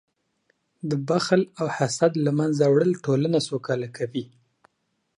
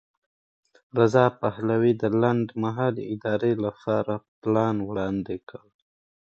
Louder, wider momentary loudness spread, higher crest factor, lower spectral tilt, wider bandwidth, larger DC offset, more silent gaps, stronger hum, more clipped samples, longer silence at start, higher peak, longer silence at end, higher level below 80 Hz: about the same, -24 LUFS vs -25 LUFS; about the same, 11 LU vs 10 LU; about the same, 20 dB vs 22 dB; second, -6 dB/octave vs -8.5 dB/octave; first, 11 kHz vs 7.6 kHz; neither; second, none vs 4.28-4.42 s; neither; neither; about the same, 0.85 s vs 0.95 s; about the same, -6 dBFS vs -4 dBFS; first, 0.95 s vs 0.75 s; second, -70 dBFS vs -60 dBFS